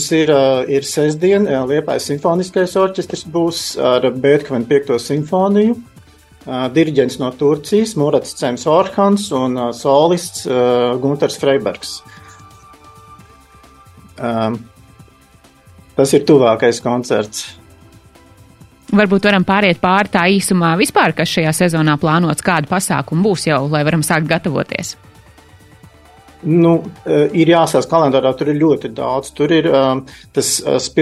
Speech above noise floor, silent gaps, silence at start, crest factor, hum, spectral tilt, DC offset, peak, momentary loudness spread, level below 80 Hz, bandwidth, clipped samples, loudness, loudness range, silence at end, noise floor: 33 dB; none; 0 s; 16 dB; none; -5 dB/octave; under 0.1%; 0 dBFS; 8 LU; -50 dBFS; 14.5 kHz; under 0.1%; -15 LUFS; 5 LU; 0 s; -47 dBFS